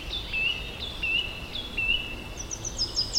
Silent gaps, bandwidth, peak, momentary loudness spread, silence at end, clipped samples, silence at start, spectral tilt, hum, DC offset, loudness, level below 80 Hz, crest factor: none; 16 kHz; -14 dBFS; 9 LU; 0 s; under 0.1%; 0 s; -1.5 dB/octave; none; under 0.1%; -28 LUFS; -42 dBFS; 18 dB